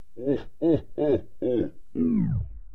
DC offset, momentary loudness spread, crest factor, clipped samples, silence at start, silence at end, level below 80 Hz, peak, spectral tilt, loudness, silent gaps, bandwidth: 1%; 4 LU; 14 dB; under 0.1%; 0 s; 0 s; -44 dBFS; -12 dBFS; -11 dB/octave; -27 LUFS; none; 5.4 kHz